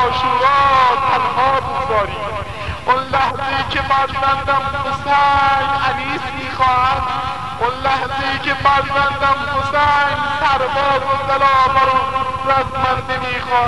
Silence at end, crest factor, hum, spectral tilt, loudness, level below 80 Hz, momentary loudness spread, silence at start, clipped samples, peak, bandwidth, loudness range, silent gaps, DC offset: 0 s; 16 dB; none; -4.5 dB/octave; -16 LUFS; -38 dBFS; 8 LU; 0 s; under 0.1%; 0 dBFS; 11.5 kHz; 3 LU; none; 1%